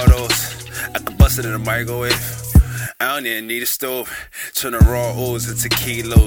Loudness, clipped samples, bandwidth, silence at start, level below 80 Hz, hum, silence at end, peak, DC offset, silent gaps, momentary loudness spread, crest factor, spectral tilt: -18 LUFS; under 0.1%; 17 kHz; 0 s; -20 dBFS; none; 0 s; 0 dBFS; under 0.1%; none; 10 LU; 16 dB; -4.5 dB/octave